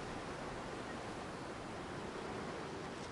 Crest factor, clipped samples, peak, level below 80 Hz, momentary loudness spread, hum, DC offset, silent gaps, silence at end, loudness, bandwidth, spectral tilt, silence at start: 12 dB; under 0.1%; -32 dBFS; -62 dBFS; 2 LU; none; under 0.1%; none; 0 s; -45 LUFS; 11.5 kHz; -5 dB/octave; 0 s